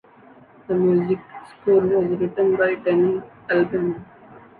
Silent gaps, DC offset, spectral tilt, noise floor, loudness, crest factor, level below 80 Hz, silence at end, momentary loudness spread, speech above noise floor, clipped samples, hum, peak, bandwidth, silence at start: none; under 0.1%; -10 dB/octave; -49 dBFS; -21 LUFS; 14 dB; -58 dBFS; 0.2 s; 9 LU; 29 dB; under 0.1%; none; -6 dBFS; 4.5 kHz; 0.7 s